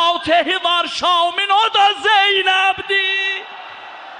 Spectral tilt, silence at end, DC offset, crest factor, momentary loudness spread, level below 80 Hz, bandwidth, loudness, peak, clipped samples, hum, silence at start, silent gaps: -1 dB/octave; 0 s; under 0.1%; 12 dB; 15 LU; -58 dBFS; 10 kHz; -14 LUFS; -4 dBFS; under 0.1%; none; 0 s; none